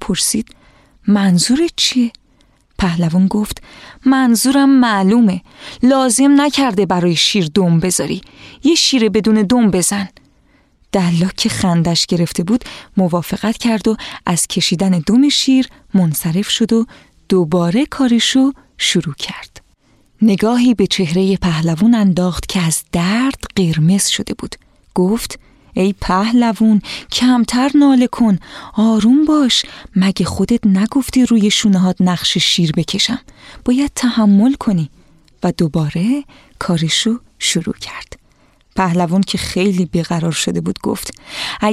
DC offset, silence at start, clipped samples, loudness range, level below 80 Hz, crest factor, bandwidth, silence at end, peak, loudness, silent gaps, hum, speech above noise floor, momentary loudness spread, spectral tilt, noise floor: under 0.1%; 0 s; under 0.1%; 4 LU; -40 dBFS; 12 dB; 15 kHz; 0 s; -2 dBFS; -14 LUFS; none; none; 39 dB; 10 LU; -4.5 dB/octave; -53 dBFS